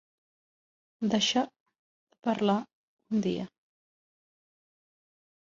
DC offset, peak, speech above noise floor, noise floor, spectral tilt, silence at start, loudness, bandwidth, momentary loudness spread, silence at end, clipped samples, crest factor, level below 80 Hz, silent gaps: under 0.1%; -12 dBFS; over 62 dB; under -90 dBFS; -4.5 dB/octave; 1 s; -30 LUFS; 7.6 kHz; 11 LU; 2 s; under 0.1%; 22 dB; -72 dBFS; 1.60-1.66 s, 1.79-2.07 s, 2.73-2.97 s